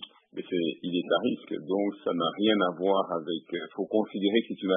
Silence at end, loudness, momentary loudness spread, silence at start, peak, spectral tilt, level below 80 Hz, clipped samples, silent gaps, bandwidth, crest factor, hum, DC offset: 0 s; -29 LUFS; 9 LU; 0 s; -10 dBFS; -9.5 dB/octave; -80 dBFS; under 0.1%; none; 3.8 kHz; 18 dB; none; under 0.1%